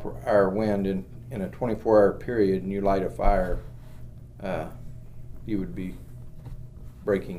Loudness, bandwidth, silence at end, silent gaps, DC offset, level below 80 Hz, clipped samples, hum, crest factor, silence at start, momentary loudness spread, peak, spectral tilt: -26 LUFS; 14.5 kHz; 0 s; none; under 0.1%; -36 dBFS; under 0.1%; none; 18 dB; 0 s; 23 LU; -8 dBFS; -8.5 dB/octave